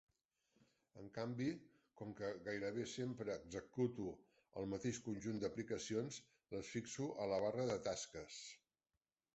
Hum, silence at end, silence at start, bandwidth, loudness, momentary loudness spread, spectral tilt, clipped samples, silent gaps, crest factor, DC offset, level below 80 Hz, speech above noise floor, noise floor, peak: none; 0.8 s; 0.95 s; 8 kHz; -46 LUFS; 13 LU; -5.5 dB/octave; under 0.1%; none; 18 dB; under 0.1%; -74 dBFS; over 45 dB; under -90 dBFS; -28 dBFS